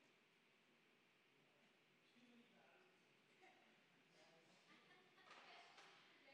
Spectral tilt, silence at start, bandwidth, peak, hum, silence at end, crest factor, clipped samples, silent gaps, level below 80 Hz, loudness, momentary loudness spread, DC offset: -3 dB/octave; 0 s; 9 kHz; -52 dBFS; none; 0 s; 20 dB; under 0.1%; none; under -90 dBFS; -66 LUFS; 4 LU; under 0.1%